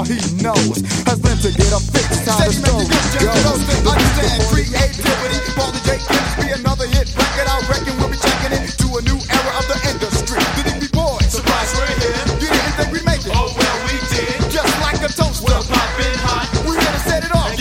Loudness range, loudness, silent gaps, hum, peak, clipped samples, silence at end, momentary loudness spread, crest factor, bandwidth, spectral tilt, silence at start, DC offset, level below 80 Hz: 3 LU; -16 LUFS; none; none; 0 dBFS; under 0.1%; 0 s; 4 LU; 16 dB; 16.5 kHz; -4 dB/octave; 0 s; under 0.1%; -22 dBFS